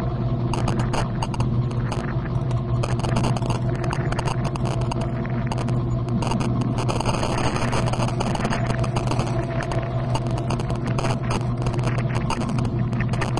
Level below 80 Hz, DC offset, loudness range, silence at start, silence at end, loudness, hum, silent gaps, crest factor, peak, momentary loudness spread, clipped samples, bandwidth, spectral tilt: -34 dBFS; under 0.1%; 1 LU; 0 s; 0 s; -24 LUFS; none; none; 16 dB; -8 dBFS; 2 LU; under 0.1%; 11 kHz; -6.5 dB/octave